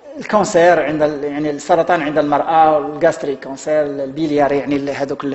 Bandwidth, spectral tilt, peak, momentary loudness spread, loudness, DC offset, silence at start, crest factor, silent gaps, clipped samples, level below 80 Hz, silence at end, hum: 8.4 kHz; -5.5 dB/octave; 0 dBFS; 9 LU; -16 LUFS; under 0.1%; 0.05 s; 16 dB; none; under 0.1%; -52 dBFS; 0 s; none